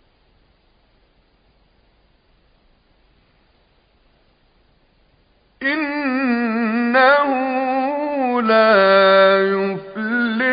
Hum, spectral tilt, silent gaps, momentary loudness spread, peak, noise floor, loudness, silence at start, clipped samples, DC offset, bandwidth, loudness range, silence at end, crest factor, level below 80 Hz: none; -10 dB/octave; none; 10 LU; -2 dBFS; -58 dBFS; -16 LUFS; 5.6 s; under 0.1%; under 0.1%; 5.2 kHz; 12 LU; 0 s; 18 dB; -60 dBFS